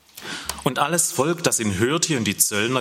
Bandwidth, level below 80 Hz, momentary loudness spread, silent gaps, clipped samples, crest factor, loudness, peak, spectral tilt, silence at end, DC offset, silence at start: 16.5 kHz; -54 dBFS; 9 LU; none; under 0.1%; 20 dB; -21 LUFS; -2 dBFS; -3 dB/octave; 0 s; under 0.1%; 0.15 s